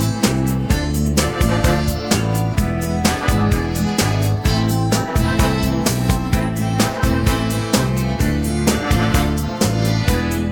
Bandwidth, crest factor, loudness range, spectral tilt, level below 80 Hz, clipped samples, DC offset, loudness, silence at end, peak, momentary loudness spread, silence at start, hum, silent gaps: 19 kHz; 16 dB; 0 LU; -5.5 dB/octave; -26 dBFS; under 0.1%; under 0.1%; -18 LUFS; 0 s; 0 dBFS; 2 LU; 0 s; none; none